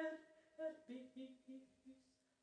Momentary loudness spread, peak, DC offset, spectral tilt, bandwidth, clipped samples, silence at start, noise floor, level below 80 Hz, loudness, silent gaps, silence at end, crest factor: 16 LU; -34 dBFS; under 0.1%; -4.5 dB/octave; 9.6 kHz; under 0.1%; 0 s; -76 dBFS; under -90 dBFS; -54 LUFS; none; 0.4 s; 18 dB